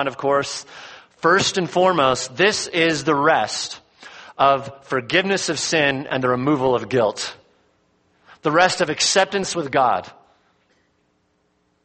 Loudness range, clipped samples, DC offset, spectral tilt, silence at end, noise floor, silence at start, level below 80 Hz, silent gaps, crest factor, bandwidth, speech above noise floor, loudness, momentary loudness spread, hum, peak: 3 LU; under 0.1%; under 0.1%; -3 dB/octave; 1.75 s; -66 dBFS; 0 s; -58 dBFS; none; 20 dB; 8.8 kHz; 46 dB; -19 LUFS; 12 LU; none; -2 dBFS